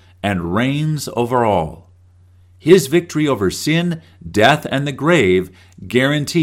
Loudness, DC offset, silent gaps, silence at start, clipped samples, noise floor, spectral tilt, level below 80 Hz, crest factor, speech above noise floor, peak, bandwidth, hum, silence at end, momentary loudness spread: -16 LUFS; under 0.1%; none; 0.25 s; 0.1%; -48 dBFS; -5.5 dB/octave; -46 dBFS; 16 dB; 32 dB; 0 dBFS; 16.5 kHz; none; 0 s; 10 LU